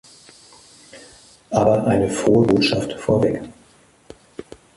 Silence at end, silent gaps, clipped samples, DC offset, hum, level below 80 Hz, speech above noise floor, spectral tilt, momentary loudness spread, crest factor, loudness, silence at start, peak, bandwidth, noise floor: 0.35 s; none; under 0.1%; under 0.1%; none; -48 dBFS; 35 dB; -6 dB/octave; 24 LU; 18 dB; -18 LUFS; 0.95 s; -4 dBFS; 11.5 kHz; -53 dBFS